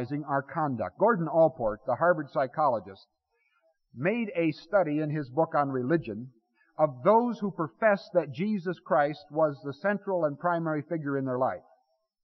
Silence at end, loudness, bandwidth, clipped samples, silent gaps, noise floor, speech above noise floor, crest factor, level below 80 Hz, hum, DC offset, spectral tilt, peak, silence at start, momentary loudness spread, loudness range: 0.65 s; -28 LUFS; 6 kHz; under 0.1%; none; -72 dBFS; 44 dB; 18 dB; -64 dBFS; none; under 0.1%; -6.5 dB/octave; -10 dBFS; 0 s; 7 LU; 3 LU